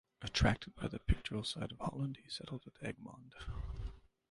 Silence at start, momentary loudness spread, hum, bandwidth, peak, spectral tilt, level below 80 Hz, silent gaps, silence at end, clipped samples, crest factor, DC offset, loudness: 0.2 s; 15 LU; none; 11.5 kHz; -16 dBFS; -5.5 dB/octave; -46 dBFS; none; 0.35 s; under 0.1%; 24 dB; under 0.1%; -40 LUFS